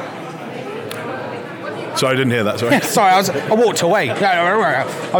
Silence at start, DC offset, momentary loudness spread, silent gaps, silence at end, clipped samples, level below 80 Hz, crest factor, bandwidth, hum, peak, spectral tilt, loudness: 0 s; under 0.1%; 14 LU; none; 0 s; under 0.1%; -74 dBFS; 14 dB; 19 kHz; none; -2 dBFS; -4 dB/octave; -16 LUFS